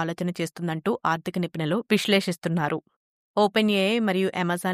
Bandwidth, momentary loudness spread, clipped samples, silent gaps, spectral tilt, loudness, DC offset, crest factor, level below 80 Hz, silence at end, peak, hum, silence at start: 15.5 kHz; 8 LU; under 0.1%; 2.96-3.34 s; -5.5 dB/octave; -25 LUFS; under 0.1%; 16 dB; -70 dBFS; 0 s; -8 dBFS; none; 0 s